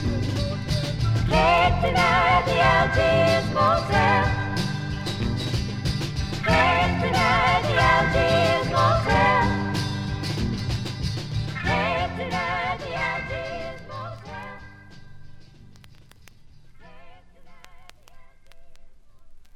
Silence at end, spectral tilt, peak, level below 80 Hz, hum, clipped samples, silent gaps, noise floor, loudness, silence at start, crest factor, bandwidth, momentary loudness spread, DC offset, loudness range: 0.05 s; -5.5 dB/octave; -6 dBFS; -36 dBFS; none; under 0.1%; none; -48 dBFS; -22 LUFS; 0 s; 18 dB; 14.5 kHz; 11 LU; under 0.1%; 12 LU